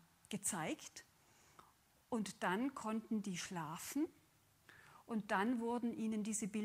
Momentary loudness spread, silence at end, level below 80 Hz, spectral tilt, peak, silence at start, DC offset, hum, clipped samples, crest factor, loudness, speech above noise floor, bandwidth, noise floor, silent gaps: 11 LU; 0 s; -80 dBFS; -4 dB/octave; -22 dBFS; 0.3 s; under 0.1%; none; under 0.1%; 20 dB; -42 LUFS; 30 dB; 16 kHz; -71 dBFS; none